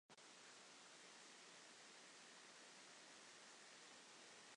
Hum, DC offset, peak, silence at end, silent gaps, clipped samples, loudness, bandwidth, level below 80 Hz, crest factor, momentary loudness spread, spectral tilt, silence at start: none; under 0.1%; -50 dBFS; 0 s; none; under 0.1%; -62 LUFS; 11 kHz; under -90 dBFS; 14 dB; 1 LU; -0.5 dB/octave; 0.1 s